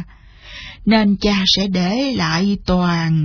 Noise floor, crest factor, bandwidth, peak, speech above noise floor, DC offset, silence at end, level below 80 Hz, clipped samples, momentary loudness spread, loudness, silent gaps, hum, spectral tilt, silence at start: -41 dBFS; 14 dB; 5.4 kHz; -2 dBFS; 25 dB; under 0.1%; 0 s; -36 dBFS; under 0.1%; 13 LU; -16 LUFS; none; none; -5.5 dB/octave; 0 s